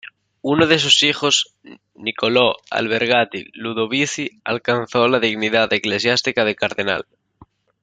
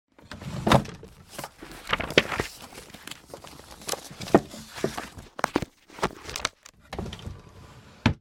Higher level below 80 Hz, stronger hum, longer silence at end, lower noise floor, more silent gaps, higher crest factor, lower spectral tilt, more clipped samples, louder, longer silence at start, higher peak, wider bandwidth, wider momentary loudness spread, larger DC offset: second, -60 dBFS vs -48 dBFS; neither; first, 0.8 s vs 0.05 s; about the same, -51 dBFS vs -49 dBFS; neither; second, 18 dB vs 28 dB; second, -3 dB/octave vs -4.5 dB/octave; neither; first, -18 LUFS vs -28 LUFS; second, 0.05 s vs 0.25 s; about the same, 0 dBFS vs -2 dBFS; second, 9.6 kHz vs 17.5 kHz; second, 12 LU vs 21 LU; neither